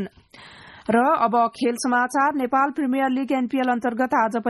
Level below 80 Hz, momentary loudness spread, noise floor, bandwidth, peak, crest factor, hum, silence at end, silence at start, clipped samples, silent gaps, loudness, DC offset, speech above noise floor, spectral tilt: -64 dBFS; 4 LU; -47 dBFS; 12 kHz; -6 dBFS; 16 dB; none; 0 s; 0 s; under 0.1%; none; -21 LUFS; under 0.1%; 26 dB; -4.5 dB/octave